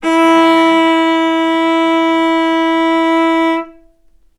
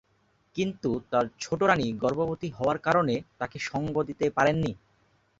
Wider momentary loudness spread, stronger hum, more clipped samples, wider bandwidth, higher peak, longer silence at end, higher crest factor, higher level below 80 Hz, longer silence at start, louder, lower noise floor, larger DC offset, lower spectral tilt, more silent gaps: second, 4 LU vs 8 LU; neither; neither; first, 11 kHz vs 7.8 kHz; first, 0 dBFS vs -6 dBFS; about the same, 0.7 s vs 0.65 s; second, 12 dB vs 22 dB; about the same, -56 dBFS vs -56 dBFS; second, 0 s vs 0.55 s; first, -12 LUFS vs -28 LUFS; second, -49 dBFS vs -68 dBFS; neither; second, -3 dB/octave vs -6 dB/octave; neither